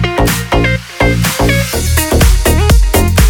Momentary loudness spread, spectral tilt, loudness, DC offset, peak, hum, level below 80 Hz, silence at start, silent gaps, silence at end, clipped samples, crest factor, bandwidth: 3 LU; -4.5 dB/octave; -11 LUFS; under 0.1%; 0 dBFS; none; -14 dBFS; 0 s; none; 0 s; under 0.1%; 10 dB; over 20 kHz